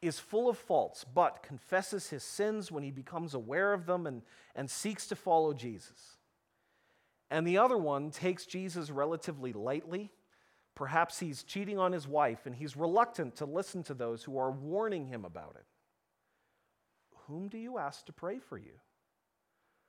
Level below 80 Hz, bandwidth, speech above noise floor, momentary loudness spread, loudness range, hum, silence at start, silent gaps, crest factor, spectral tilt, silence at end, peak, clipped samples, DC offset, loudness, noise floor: -80 dBFS; 17 kHz; 47 dB; 14 LU; 11 LU; none; 0 s; none; 22 dB; -5 dB/octave; 1.2 s; -14 dBFS; under 0.1%; under 0.1%; -35 LUFS; -82 dBFS